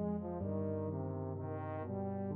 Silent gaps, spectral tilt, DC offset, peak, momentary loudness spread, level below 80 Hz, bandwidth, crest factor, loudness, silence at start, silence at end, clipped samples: none; -11 dB/octave; under 0.1%; -26 dBFS; 3 LU; -64 dBFS; 3.1 kHz; 12 dB; -41 LUFS; 0 s; 0 s; under 0.1%